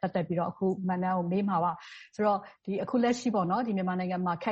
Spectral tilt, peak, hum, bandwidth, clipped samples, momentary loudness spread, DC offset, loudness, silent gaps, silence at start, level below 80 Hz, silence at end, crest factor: -7 dB/octave; -16 dBFS; none; 8.2 kHz; under 0.1%; 6 LU; under 0.1%; -30 LUFS; none; 0.05 s; -68 dBFS; 0 s; 14 dB